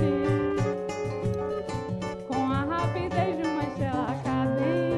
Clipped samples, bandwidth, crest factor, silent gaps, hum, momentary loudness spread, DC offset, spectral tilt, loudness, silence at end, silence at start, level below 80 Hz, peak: under 0.1%; 11.5 kHz; 14 dB; none; none; 6 LU; under 0.1%; -7.5 dB/octave; -28 LUFS; 0 s; 0 s; -48 dBFS; -12 dBFS